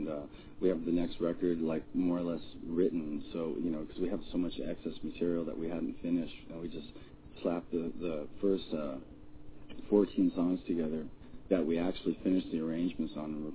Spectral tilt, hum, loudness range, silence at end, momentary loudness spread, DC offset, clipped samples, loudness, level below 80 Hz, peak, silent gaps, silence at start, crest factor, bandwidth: -7 dB/octave; none; 5 LU; 0 s; 13 LU; under 0.1%; under 0.1%; -35 LUFS; -56 dBFS; -14 dBFS; none; 0 s; 20 dB; 4 kHz